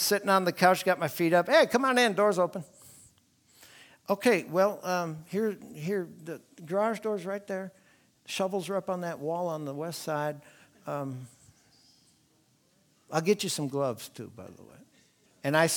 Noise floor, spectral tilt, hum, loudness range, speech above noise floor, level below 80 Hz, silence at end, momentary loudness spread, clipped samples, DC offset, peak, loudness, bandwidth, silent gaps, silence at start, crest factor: -67 dBFS; -4 dB/octave; none; 10 LU; 39 dB; -76 dBFS; 0 s; 20 LU; under 0.1%; under 0.1%; -8 dBFS; -28 LUFS; 19.5 kHz; none; 0 s; 22 dB